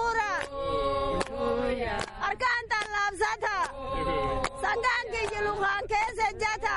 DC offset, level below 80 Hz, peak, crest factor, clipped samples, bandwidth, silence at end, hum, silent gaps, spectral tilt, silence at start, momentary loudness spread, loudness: under 0.1%; -44 dBFS; -12 dBFS; 16 dB; under 0.1%; 11.5 kHz; 0 s; none; none; -3.5 dB/octave; 0 s; 4 LU; -29 LUFS